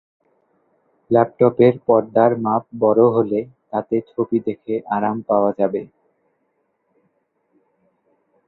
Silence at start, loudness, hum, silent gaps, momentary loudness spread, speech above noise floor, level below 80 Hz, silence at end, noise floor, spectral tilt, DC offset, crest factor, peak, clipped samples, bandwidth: 1.1 s; -18 LUFS; none; none; 10 LU; 51 dB; -62 dBFS; 2.6 s; -69 dBFS; -11.5 dB/octave; under 0.1%; 20 dB; -2 dBFS; under 0.1%; 4.2 kHz